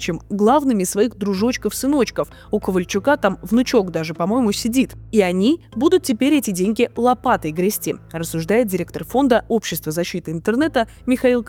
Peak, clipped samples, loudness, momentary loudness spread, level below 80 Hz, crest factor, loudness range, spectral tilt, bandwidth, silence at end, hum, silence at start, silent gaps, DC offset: -2 dBFS; under 0.1%; -19 LUFS; 7 LU; -46 dBFS; 16 dB; 2 LU; -5 dB/octave; 19 kHz; 0 s; none; 0 s; none; under 0.1%